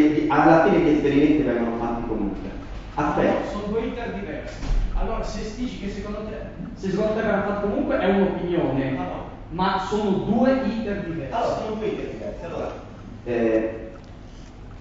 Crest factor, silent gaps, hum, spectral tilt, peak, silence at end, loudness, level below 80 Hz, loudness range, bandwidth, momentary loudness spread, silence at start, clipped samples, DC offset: 20 dB; none; none; -7.5 dB/octave; -4 dBFS; 0 s; -23 LUFS; -36 dBFS; 7 LU; 7.8 kHz; 16 LU; 0 s; under 0.1%; under 0.1%